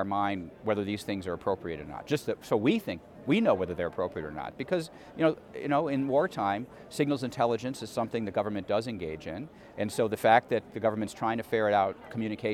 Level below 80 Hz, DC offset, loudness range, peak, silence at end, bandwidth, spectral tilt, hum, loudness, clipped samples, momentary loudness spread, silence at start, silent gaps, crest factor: -62 dBFS; under 0.1%; 3 LU; -8 dBFS; 0 s; 16.5 kHz; -6 dB/octave; none; -30 LUFS; under 0.1%; 12 LU; 0 s; none; 22 dB